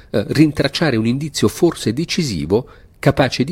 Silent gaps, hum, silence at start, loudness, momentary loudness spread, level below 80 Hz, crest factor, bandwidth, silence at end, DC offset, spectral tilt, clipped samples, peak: none; none; 0.15 s; -17 LUFS; 5 LU; -42 dBFS; 16 dB; 16.5 kHz; 0 s; under 0.1%; -5.5 dB/octave; under 0.1%; 0 dBFS